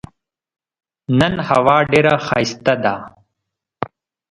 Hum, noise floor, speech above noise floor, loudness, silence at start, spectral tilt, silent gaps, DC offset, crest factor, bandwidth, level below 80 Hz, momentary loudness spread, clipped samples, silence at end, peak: none; -79 dBFS; 64 dB; -15 LUFS; 1.1 s; -6 dB/octave; none; under 0.1%; 18 dB; 11.5 kHz; -48 dBFS; 16 LU; under 0.1%; 0.45 s; 0 dBFS